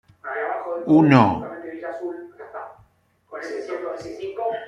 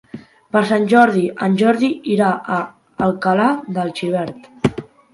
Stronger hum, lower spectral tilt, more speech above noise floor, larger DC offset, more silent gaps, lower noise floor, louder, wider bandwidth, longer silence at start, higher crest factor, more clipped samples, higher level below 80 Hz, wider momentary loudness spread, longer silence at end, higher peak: neither; about the same, -8 dB/octave vs -7 dB/octave; first, 40 dB vs 21 dB; neither; neither; first, -60 dBFS vs -38 dBFS; second, -22 LUFS vs -17 LUFS; second, 7.6 kHz vs 11.5 kHz; about the same, 0.25 s vs 0.15 s; about the same, 20 dB vs 16 dB; neither; second, -60 dBFS vs -54 dBFS; first, 22 LU vs 10 LU; second, 0 s vs 0.3 s; about the same, -2 dBFS vs 0 dBFS